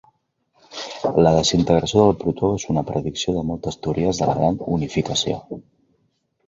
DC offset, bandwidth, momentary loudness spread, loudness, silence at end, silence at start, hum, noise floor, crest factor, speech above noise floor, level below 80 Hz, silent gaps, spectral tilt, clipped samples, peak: under 0.1%; 7.8 kHz; 13 LU; -20 LUFS; 0.85 s; 0.7 s; none; -68 dBFS; 20 dB; 48 dB; -44 dBFS; none; -5.5 dB/octave; under 0.1%; -2 dBFS